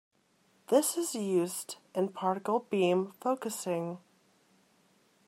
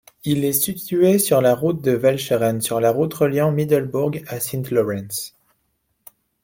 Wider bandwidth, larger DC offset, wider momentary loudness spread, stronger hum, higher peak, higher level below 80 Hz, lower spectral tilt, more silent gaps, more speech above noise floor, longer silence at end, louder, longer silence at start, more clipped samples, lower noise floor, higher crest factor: about the same, 16 kHz vs 17 kHz; neither; about the same, 9 LU vs 9 LU; neither; second, -12 dBFS vs -4 dBFS; second, -86 dBFS vs -58 dBFS; about the same, -4.5 dB/octave vs -5.5 dB/octave; neither; second, 38 dB vs 51 dB; first, 1.3 s vs 1.15 s; second, -32 LUFS vs -19 LUFS; first, 0.7 s vs 0.25 s; neither; about the same, -69 dBFS vs -70 dBFS; about the same, 20 dB vs 16 dB